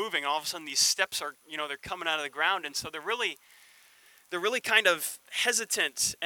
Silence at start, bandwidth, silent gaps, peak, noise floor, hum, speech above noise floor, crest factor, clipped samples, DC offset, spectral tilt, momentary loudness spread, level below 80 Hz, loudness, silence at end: 0 s; 19.5 kHz; none; -8 dBFS; -59 dBFS; none; 29 dB; 24 dB; under 0.1%; under 0.1%; 0.5 dB/octave; 12 LU; -70 dBFS; -28 LUFS; 0 s